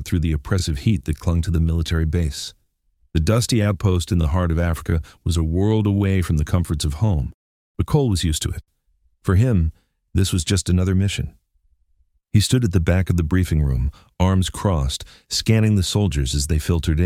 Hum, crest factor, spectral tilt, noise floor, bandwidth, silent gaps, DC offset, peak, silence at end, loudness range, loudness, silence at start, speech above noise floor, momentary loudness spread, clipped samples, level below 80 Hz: none; 16 dB; -6 dB/octave; -63 dBFS; 15.5 kHz; 7.34-7.75 s; under 0.1%; -4 dBFS; 0 s; 2 LU; -21 LUFS; 0 s; 44 dB; 8 LU; under 0.1%; -28 dBFS